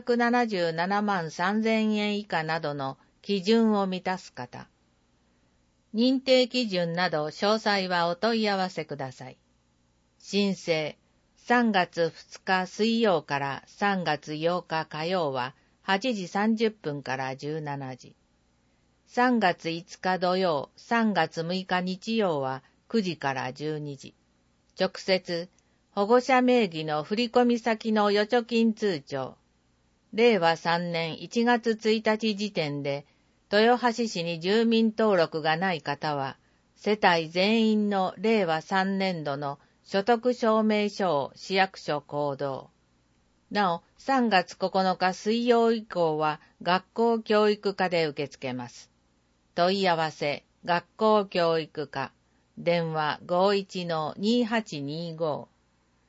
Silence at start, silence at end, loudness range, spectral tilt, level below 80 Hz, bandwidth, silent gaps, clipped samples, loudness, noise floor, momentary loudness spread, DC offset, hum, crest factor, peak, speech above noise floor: 0.05 s; 0.65 s; 4 LU; -5.5 dB/octave; -72 dBFS; 8 kHz; none; under 0.1%; -27 LUFS; -68 dBFS; 12 LU; under 0.1%; none; 20 dB; -6 dBFS; 41 dB